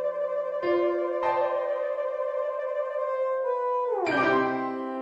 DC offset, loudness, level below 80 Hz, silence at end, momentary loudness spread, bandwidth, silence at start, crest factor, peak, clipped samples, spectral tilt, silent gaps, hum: under 0.1%; -27 LUFS; -70 dBFS; 0 s; 6 LU; 7.8 kHz; 0 s; 14 dB; -12 dBFS; under 0.1%; -6 dB/octave; none; none